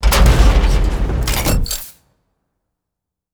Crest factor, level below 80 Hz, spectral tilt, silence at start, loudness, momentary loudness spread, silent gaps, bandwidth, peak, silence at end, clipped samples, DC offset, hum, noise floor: 14 dB; -16 dBFS; -4.5 dB/octave; 0 s; -16 LUFS; 11 LU; none; over 20 kHz; 0 dBFS; 1.45 s; under 0.1%; under 0.1%; none; -81 dBFS